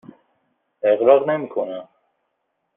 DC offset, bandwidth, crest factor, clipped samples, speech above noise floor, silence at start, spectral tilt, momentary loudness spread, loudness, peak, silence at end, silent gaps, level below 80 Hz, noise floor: under 0.1%; 3.7 kHz; 20 dB; under 0.1%; 56 dB; 0.85 s; -4.5 dB/octave; 14 LU; -19 LUFS; -2 dBFS; 0.95 s; none; -68 dBFS; -74 dBFS